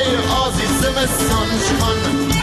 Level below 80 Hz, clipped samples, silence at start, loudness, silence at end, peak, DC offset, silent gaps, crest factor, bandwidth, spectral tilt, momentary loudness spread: -28 dBFS; under 0.1%; 0 s; -17 LUFS; 0 s; -8 dBFS; under 0.1%; none; 10 dB; 13.5 kHz; -4 dB/octave; 1 LU